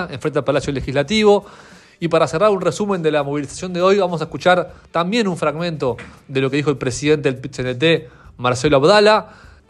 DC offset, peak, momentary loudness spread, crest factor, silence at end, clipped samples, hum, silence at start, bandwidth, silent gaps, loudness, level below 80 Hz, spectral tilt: under 0.1%; 0 dBFS; 10 LU; 16 dB; 0.45 s; under 0.1%; none; 0 s; 11.5 kHz; none; -18 LUFS; -46 dBFS; -5 dB/octave